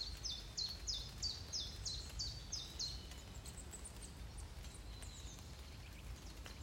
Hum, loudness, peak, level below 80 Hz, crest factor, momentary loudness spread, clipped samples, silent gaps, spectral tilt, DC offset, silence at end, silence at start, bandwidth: none; -47 LUFS; -30 dBFS; -54 dBFS; 18 dB; 11 LU; under 0.1%; none; -2 dB/octave; under 0.1%; 0 s; 0 s; 16 kHz